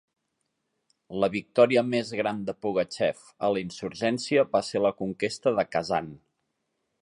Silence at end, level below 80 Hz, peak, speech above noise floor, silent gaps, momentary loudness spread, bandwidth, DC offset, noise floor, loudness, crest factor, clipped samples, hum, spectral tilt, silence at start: 0.85 s; -64 dBFS; -6 dBFS; 53 dB; none; 8 LU; 11 kHz; under 0.1%; -79 dBFS; -27 LUFS; 20 dB; under 0.1%; none; -5 dB/octave; 1.1 s